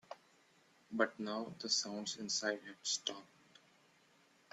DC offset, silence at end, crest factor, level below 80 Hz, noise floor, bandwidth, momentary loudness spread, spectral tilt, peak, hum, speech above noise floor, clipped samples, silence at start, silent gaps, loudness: under 0.1%; 1.25 s; 26 dB; -86 dBFS; -70 dBFS; 13 kHz; 13 LU; -1.5 dB/octave; -16 dBFS; none; 30 dB; under 0.1%; 0.1 s; none; -39 LUFS